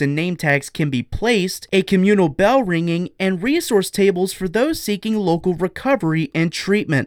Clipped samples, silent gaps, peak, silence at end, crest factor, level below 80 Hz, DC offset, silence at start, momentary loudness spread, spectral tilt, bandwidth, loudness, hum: under 0.1%; none; -4 dBFS; 0 s; 14 dB; -44 dBFS; under 0.1%; 0 s; 6 LU; -5.5 dB/octave; 17.5 kHz; -19 LUFS; none